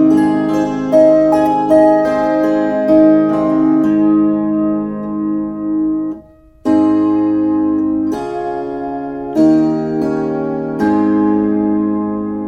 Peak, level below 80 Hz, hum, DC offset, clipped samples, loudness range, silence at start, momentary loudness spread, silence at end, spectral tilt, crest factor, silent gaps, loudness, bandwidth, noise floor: 0 dBFS; -46 dBFS; none; under 0.1%; under 0.1%; 5 LU; 0 s; 11 LU; 0 s; -8.5 dB/octave; 12 dB; none; -14 LUFS; 6.8 kHz; -39 dBFS